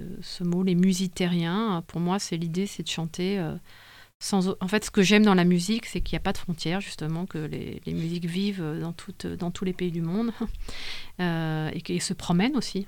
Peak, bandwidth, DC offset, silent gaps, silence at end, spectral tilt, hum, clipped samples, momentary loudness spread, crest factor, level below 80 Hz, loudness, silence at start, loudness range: -6 dBFS; 16.5 kHz; under 0.1%; 4.15-4.20 s; 0 s; -5.5 dB/octave; none; under 0.1%; 12 LU; 20 dB; -44 dBFS; -27 LUFS; 0 s; 7 LU